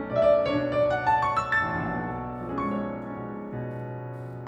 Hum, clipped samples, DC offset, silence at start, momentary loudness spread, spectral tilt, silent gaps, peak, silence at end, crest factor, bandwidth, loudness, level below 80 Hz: none; under 0.1%; under 0.1%; 0 s; 14 LU; -7.5 dB/octave; none; -12 dBFS; 0 s; 16 dB; 8.4 kHz; -27 LUFS; -50 dBFS